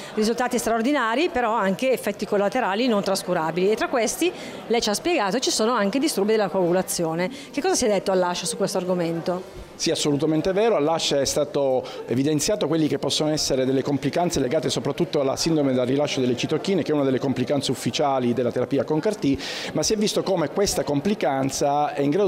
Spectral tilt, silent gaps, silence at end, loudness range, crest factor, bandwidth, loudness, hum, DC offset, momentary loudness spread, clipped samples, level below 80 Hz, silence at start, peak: -4.5 dB/octave; none; 0 s; 1 LU; 10 dB; 16 kHz; -23 LUFS; none; under 0.1%; 4 LU; under 0.1%; -52 dBFS; 0 s; -12 dBFS